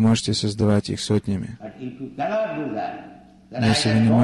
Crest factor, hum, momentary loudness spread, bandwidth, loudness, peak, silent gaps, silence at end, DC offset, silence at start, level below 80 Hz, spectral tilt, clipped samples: 14 dB; none; 17 LU; 12 kHz; -22 LUFS; -6 dBFS; none; 0 s; under 0.1%; 0 s; -46 dBFS; -5.5 dB/octave; under 0.1%